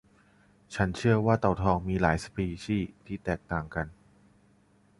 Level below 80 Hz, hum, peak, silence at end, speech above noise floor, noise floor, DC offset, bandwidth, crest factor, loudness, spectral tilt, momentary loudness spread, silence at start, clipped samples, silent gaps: -46 dBFS; none; -8 dBFS; 1.05 s; 35 dB; -63 dBFS; under 0.1%; 11.5 kHz; 22 dB; -29 LUFS; -7 dB/octave; 12 LU; 0.7 s; under 0.1%; none